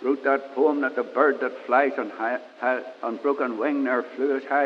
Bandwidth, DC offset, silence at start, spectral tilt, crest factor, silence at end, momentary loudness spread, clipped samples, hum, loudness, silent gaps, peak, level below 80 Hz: 6.6 kHz; under 0.1%; 0 s; -6 dB/octave; 20 dB; 0 s; 7 LU; under 0.1%; none; -25 LUFS; none; -4 dBFS; under -90 dBFS